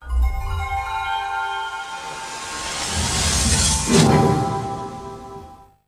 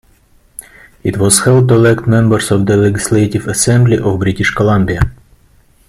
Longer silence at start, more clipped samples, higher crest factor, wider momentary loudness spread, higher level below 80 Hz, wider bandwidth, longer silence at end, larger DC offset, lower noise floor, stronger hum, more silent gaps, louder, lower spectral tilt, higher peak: second, 0 s vs 1.05 s; neither; first, 20 dB vs 12 dB; first, 16 LU vs 12 LU; about the same, -30 dBFS vs -32 dBFS; about the same, 15.5 kHz vs 15 kHz; second, 0.25 s vs 0.75 s; neither; second, -42 dBFS vs -49 dBFS; neither; neither; second, -21 LUFS vs -11 LUFS; second, -3.5 dB/octave vs -5.5 dB/octave; about the same, -2 dBFS vs 0 dBFS